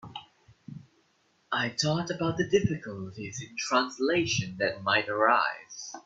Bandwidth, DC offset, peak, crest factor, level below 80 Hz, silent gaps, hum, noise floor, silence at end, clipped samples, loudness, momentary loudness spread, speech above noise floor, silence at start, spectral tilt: 8.2 kHz; under 0.1%; -10 dBFS; 20 dB; -62 dBFS; none; none; -69 dBFS; 0.05 s; under 0.1%; -28 LUFS; 20 LU; 40 dB; 0.05 s; -4 dB/octave